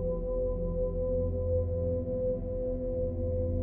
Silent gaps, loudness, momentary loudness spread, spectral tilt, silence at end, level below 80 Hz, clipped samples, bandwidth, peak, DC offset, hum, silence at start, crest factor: none; -32 LUFS; 3 LU; -14.5 dB/octave; 0 s; -38 dBFS; under 0.1%; 2.1 kHz; -18 dBFS; under 0.1%; none; 0 s; 12 dB